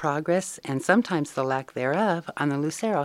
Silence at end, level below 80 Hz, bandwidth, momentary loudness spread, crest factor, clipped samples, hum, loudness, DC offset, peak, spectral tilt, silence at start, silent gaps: 0 s; -72 dBFS; 15.5 kHz; 5 LU; 20 dB; under 0.1%; none; -26 LUFS; under 0.1%; -4 dBFS; -5.5 dB/octave; 0 s; none